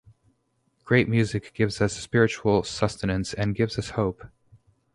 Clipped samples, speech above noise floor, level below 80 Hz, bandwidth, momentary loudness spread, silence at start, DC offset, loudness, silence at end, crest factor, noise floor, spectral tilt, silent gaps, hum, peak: under 0.1%; 46 dB; -48 dBFS; 11.5 kHz; 7 LU; 0.85 s; under 0.1%; -25 LUFS; 0.7 s; 22 dB; -71 dBFS; -6 dB/octave; none; none; -4 dBFS